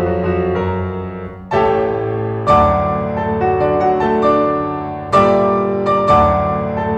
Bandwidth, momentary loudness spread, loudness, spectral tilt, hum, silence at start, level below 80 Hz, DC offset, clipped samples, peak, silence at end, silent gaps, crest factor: 8.8 kHz; 9 LU; -15 LUFS; -8 dB/octave; none; 0 s; -34 dBFS; under 0.1%; under 0.1%; 0 dBFS; 0 s; none; 14 dB